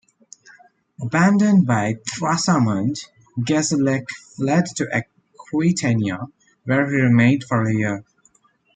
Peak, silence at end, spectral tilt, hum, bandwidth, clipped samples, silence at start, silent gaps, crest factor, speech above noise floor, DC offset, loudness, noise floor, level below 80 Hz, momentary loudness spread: -2 dBFS; 0.75 s; -5.5 dB/octave; none; 9.4 kHz; under 0.1%; 1 s; none; 18 dB; 41 dB; under 0.1%; -19 LUFS; -59 dBFS; -60 dBFS; 16 LU